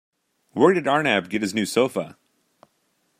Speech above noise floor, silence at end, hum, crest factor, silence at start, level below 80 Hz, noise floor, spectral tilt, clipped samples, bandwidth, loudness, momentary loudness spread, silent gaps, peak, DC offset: 48 dB; 1.1 s; none; 20 dB; 0.55 s; -70 dBFS; -69 dBFS; -4.5 dB/octave; under 0.1%; 15.5 kHz; -21 LUFS; 13 LU; none; -2 dBFS; under 0.1%